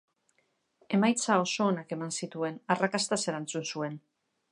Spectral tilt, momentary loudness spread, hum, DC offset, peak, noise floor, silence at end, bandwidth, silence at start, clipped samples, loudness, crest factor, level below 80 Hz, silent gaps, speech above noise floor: -4 dB/octave; 9 LU; none; under 0.1%; -10 dBFS; -75 dBFS; 0.55 s; 11.5 kHz; 0.9 s; under 0.1%; -30 LUFS; 22 dB; -80 dBFS; none; 45 dB